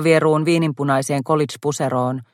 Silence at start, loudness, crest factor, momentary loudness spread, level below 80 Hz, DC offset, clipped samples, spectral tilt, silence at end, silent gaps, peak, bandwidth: 0 s; -19 LUFS; 16 dB; 7 LU; -62 dBFS; under 0.1%; under 0.1%; -6 dB/octave; 0.1 s; none; -2 dBFS; 16 kHz